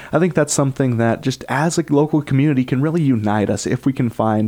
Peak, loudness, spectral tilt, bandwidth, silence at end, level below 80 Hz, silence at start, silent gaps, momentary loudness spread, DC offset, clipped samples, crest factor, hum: -2 dBFS; -18 LUFS; -6 dB/octave; 16.5 kHz; 0 s; -50 dBFS; 0 s; none; 3 LU; under 0.1%; under 0.1%; 14 dB; none